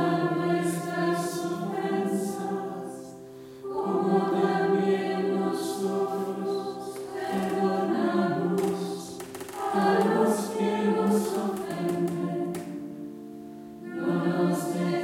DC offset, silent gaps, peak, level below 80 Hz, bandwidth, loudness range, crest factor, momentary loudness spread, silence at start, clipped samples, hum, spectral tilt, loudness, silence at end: under 0.1%; none; -10 dBFS; -72 dBFS; 16.5 kHz; 4 LU; 18 dB; 14 LU; 0 s; under 0.1%; none; -6 dB/octave; -28 LUFS; 0 s